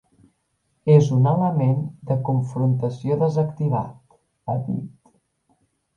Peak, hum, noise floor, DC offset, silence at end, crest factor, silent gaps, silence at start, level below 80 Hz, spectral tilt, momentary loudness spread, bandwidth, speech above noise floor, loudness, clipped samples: -2 dBFS; none; -70 dBFS; under 0.1%; 1.1 s; 20 dB; none; 0.85 s; -60 dBFS; -9.5 dB/octave; 13 LU; 7.2 kHz; 50 dB; -21 LUFS; under 0.1%